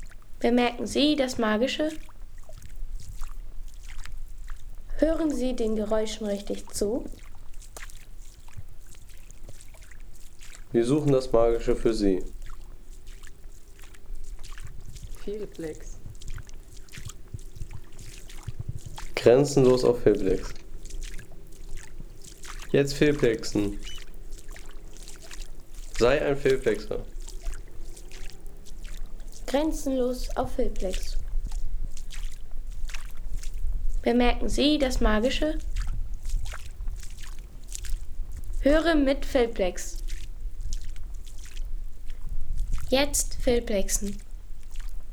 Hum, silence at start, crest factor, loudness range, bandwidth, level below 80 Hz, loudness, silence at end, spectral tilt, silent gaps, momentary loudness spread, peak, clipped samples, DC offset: none; 0 s; 20 dB; 16 LU; 16.5 kHz; -34 dBFS; -26 LUFS; 0 s; -5 dB/octave; none; 23 LU; -6 dBFS; under 0.1%; under 0.1%